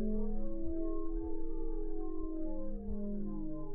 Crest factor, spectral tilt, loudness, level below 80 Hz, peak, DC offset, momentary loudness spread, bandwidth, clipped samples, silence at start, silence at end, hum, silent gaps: 10 dB; -13 dB/octave; -42 LUFS; -38 dBFS; -24 dBFS; under 0.1%; 3 LU; 1.6 kHz; under 0.1%; 0 s; 0 s; none; none